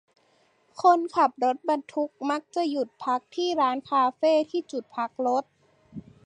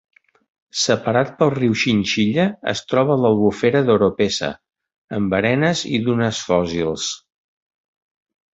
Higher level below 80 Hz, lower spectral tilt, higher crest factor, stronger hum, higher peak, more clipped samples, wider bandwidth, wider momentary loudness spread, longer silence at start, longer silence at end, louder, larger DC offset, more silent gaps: second, -74 dBFS vs -50 dBFS; about the same, -4.5 dB/octave vs -5 dB/octave; about the same, 20 dB vs 18 dB; neither; second, -8 dBFS vs -2 dBFS; neither; first, 10 kHz vs 8 kHz; about the same, 10 LU vs 8 LU; about the same, 0.75 s vs 0.75 s; second, 0.25 s vs 1.4 s; second, -26 LUFS vs -19 LUFS; neither; second, none vs 4.98-5.08 s